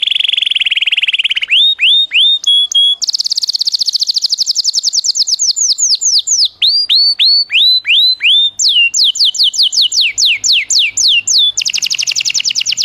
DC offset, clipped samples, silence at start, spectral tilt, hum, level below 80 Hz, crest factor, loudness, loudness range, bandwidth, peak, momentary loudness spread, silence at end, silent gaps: under 0.1%; under 0.1%; 0 s; 5.5 dB/octave; none; -62 dBFS; 10 dB; -8 LUFS; 3 LU; 16.5 kHz; -2 dBFS; 5 LU; 0 s; none